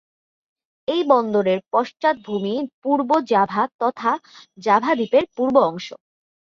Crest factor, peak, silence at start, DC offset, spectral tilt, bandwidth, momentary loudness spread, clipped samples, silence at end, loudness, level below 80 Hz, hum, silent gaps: 18 dB; -2 dBFS; 0.9 s; under 0.1%; -6 dB/octave; 7.4 kHz; 8 LU; under 0.1%; 0.5 s; -20 LUFS; -66 dBFS; none; 2.74-2.82 s, 3.74-3.79 s